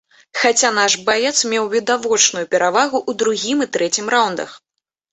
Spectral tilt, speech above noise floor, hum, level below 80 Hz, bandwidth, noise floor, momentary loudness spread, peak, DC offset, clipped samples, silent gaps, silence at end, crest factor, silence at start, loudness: -1 dB/octave; 63 dB; none; -64 dBFS; 8.4 kHz; -80 dBFS; 5 LU; -2 dBFS; under 0.1%; under 0.1%; none; 0.55 s; 16 dB; 0.35 s; -16 LUFS